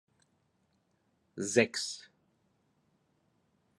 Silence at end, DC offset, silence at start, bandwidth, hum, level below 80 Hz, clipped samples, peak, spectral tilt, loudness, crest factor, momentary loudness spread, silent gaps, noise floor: 1.75 s; under 0.1%; 1.35 s; 12.5 kHz; none; -84 dBFS; under 0.1%; -10 dBFS; -3 dB/octave; -31 LUFS; 28 dB; 18 LU; none; -75 dBFS